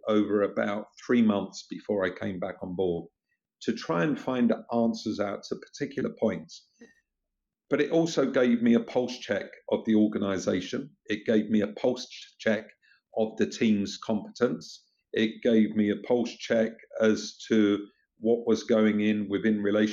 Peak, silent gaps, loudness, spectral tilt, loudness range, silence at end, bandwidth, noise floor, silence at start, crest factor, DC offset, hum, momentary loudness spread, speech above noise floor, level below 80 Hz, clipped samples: -10 dBFS; none; -28 LUFS; -6 dB/octave; 4 LU; 0 s; 7.6 kHz; -85 dBFS; 0.05 s; 18 dB; under 0.1%; none; 11 LU; 58 dB; -70 dBFS; under 0.1%